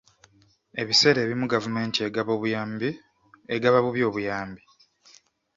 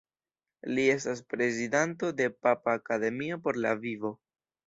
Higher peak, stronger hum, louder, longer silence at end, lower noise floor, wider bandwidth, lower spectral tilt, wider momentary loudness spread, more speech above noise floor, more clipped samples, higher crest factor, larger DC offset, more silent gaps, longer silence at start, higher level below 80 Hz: first, -4 dBFS vs -10 dBFS; neither; first, -24 LUFS vs -30 LUFS; first, 1 s vs 0.5 s; second, -59 dBFS vs under -90 dBFS; about the same, 7.8 kHz vs 8 kHz; about the same, -4 dB/octave vs -5 dB/octave; first, 14 LU vs 8 LU; second, 35 dB vs over 60 dB; neither; about the same, 22 dB vs 20 dB; neither; neither; about the same, 0.75 s vs 0.65 s; first, -64 dBFS vs -74 dBFS